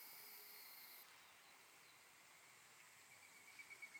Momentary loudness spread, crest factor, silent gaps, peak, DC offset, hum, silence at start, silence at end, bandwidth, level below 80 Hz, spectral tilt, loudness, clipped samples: 8 LU; 16 dB; none; -46 dBFS; under 0.1%; none; 0 s; 0 s; over 20 kHz; under -90 dBFS; 0.5 dB/octave; -61 LUFS; under 0.1%